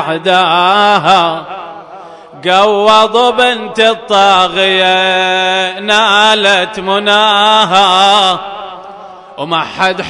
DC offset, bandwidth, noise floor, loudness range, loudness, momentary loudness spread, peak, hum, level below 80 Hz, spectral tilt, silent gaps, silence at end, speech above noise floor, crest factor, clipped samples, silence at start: under 0.1%; 11 kHz; -31 dBFS; 2 LU; -9 LUFS; 12 LU; 0 dBFS; none; -52 dBFS; -3 dB/octave; none; 0 s; 22 dB; 10 dB; 0.3%; 0 s